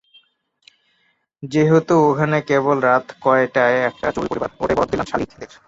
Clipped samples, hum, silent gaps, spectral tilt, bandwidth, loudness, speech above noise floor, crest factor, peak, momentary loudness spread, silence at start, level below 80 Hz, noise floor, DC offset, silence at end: under 0.1%; none; none; -7 dB/octave; 8 kHz; -18 LUFS; 47 dB; 16 dB; -2 dBFS; 9 LU; 1.4 s; -48 dBFS; -65 dBFS; under 0.1%; 0.2 s